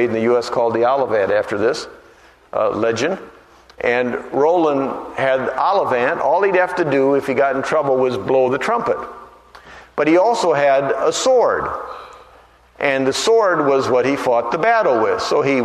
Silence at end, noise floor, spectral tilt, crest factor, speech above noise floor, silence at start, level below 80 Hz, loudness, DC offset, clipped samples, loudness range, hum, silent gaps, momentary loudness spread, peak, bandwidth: 0 s; -48 dBFS; -4.5 dB/octave; 16 dB; 31 dB; 0 s; -54 dBFS; -17 LUFS; under 0.1%; under 0.1%; 3 LU; none; none; 8 LU; -2 dBFS; 13 kHz